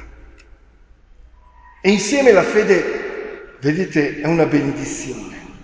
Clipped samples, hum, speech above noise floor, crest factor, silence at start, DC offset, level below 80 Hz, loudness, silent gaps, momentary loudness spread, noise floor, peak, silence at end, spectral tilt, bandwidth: under 0.1%; none; 32 dB; 18 dB; 0 s; under 0.1%; -46 dBFS; -17 LUFS; none; 17 LU; -48 dBFS; 0 dBFS; 0.1 s; -5 dB/octave; 8 kHz